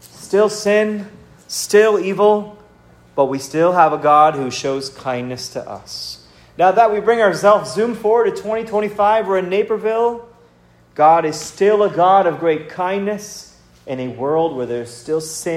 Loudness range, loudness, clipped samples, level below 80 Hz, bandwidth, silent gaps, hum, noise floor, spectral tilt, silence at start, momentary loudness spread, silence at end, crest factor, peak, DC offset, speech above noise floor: 3 LU; -16 LUFS; under 0.1%; -56 dBFS; 16 kHz; none; none; -51 dBFS; -4.5 dB/octave; 0.15 s; 15 LU; 0 s; 16 dB; 0 dBFS; under 0.1%; 35 dB